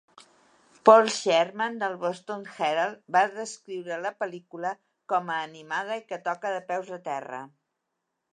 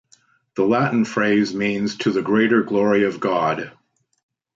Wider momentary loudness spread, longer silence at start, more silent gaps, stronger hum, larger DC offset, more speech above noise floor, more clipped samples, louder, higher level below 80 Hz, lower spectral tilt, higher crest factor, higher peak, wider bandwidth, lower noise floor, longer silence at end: first, 15 LU vs 6 LU; first, 0.85 s vs 0.55 s; neither; neither; neither; first, 55 dB vs 39 dB; neither; second, -27 LUFS vs -19 LUFS; second, -86 dBFS vs -62 dBFS; second, -3.5 dB/octave vs -6 dB/octave; first, 26 dB vs 16 dB; about the same, -2 dBFS vs -4 dBFS; first, 10.5 kHz vs 7.8 kHz; first, -81 dBFS vs -58 dBFS; about the same, 0.85 s vs 0.85 s